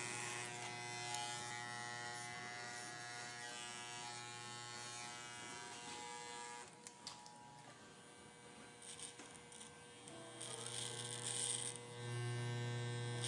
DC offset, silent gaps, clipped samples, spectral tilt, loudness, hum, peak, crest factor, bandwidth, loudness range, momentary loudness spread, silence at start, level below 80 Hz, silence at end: under 0.1%; none; under 0.1%; -2.5 dB/octave; -47 LUFS; none; -26 dBFS; 22 dB; 11.5 kHz; 10 LU; 13 LU; 0 s; -86 dBFS; 0 s